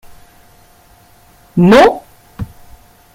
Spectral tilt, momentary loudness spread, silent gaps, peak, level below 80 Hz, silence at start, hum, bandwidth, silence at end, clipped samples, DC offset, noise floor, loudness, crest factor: -6.5 dB/octave; 23 LU; none; 0 dBFS; -42 dBFS; 1.55 s; none; 16 kHz; 0.7 s; under 0.1%; under 0.1%; -46 dBFS; -9 LUFS; 16 dB